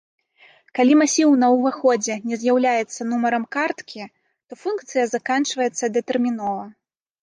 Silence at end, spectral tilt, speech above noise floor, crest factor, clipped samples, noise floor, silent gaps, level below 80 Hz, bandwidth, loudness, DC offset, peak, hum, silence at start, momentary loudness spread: 0.5 s; -3 dB/octave; 34 dB; 14 dB; under 0.1%; -54 dBFS; none; -74 dBFS; 10 kHz; -20 LUFS; under 0.1%; -6 dBFS; none; 0.75 s; 15 LU